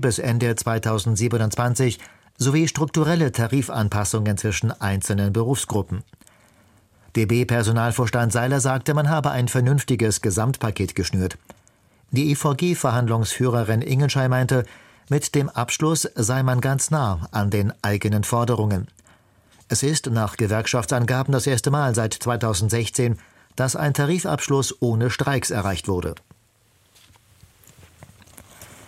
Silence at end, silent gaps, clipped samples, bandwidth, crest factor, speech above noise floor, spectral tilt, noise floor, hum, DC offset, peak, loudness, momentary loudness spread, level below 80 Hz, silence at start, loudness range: 0.05 s; none; under 0.1%; 16 kHz; 16 dB; 39 dB; -5 dB/octave; -60 dBFS; none; under 0.1%; -6 dBFS; -22 LUFS; 5 LU; -48 dBFS; 0 s; 3 LU